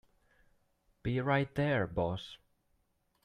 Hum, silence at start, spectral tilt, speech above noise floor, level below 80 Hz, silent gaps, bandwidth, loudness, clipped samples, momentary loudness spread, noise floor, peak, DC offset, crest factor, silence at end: none; 1.05 s; -8 dB/octave; 43 dB; -60 dBFS; none; 9.8 kHz; -34 LUFS; under 0.1%; 11 LU; -76 dBFS; -16 dBFS; under 0.1%; 20 dB; 0.9 s